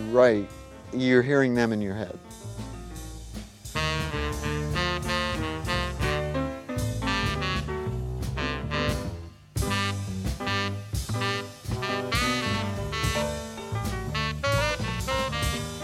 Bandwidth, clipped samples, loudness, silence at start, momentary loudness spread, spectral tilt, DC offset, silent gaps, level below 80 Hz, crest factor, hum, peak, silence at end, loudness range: 16.5 kHz; under 0.1%; -28 LUFS; 0 s; 15 LU; -5 dB/octave; under 0.1%; none; -38 dBFS; 20 dB; none; -6 dBFS; 0 s; 2 LU